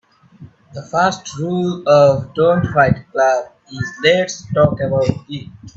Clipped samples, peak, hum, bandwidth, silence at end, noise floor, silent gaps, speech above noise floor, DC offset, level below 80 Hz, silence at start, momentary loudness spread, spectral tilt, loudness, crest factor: under 0.1%; 0 dBFS; none; 8 kHz; 0.1 s; -42 dBFS; none; 26 dB; under 0.1%; -46 dBFS; 0.4 s; 16 LU; -5.5 dB/octave; -16 LUFS; 16 dB